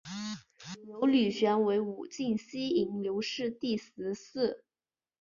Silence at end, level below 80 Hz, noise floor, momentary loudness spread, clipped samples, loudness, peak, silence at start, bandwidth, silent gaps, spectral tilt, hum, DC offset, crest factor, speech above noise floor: 0.65 s; -72 dBFS; under -90 dBFS; 16 LU; under 0.1%; -32 LUFS; -16 dBFS; 0.05 s; 7.4 kHz; none; -5.5 dB/octave; none; under 0.1%; 16 dB; over 59 dB